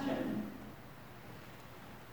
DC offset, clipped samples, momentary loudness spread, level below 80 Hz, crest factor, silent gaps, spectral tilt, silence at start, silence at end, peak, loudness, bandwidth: 0.1%; under 0.1%; 15 LU; -66 dBFS; 18 dB; none; -6.5 dB/octave; 0 s; 0 s; -24 dBFS; -45 LUFS; over 20 kHz